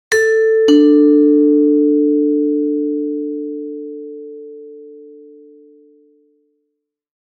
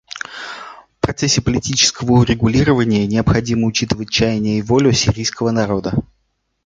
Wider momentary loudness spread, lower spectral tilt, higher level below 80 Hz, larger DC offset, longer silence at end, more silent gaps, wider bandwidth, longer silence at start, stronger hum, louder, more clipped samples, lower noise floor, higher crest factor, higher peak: first, 22 LU vs 14 LU; about the same, -3.5 dB/octave vs -4.5 dB/octave; second, -72 dBFS vs -36 dBFS; neither; first, 2.3 s vs 0.6 s; neither; first, 10.5 kHz vs 9.4 kHz; about the same, 0.1 s vs 0.15 s; neither; first, -13 LUFS vs -16 LUFS; neither; first, -74 dBFS vs -67 dBFS; about the same, 14 dB vs 16 dB; about the same, -2 dBFS vs -2 dBFS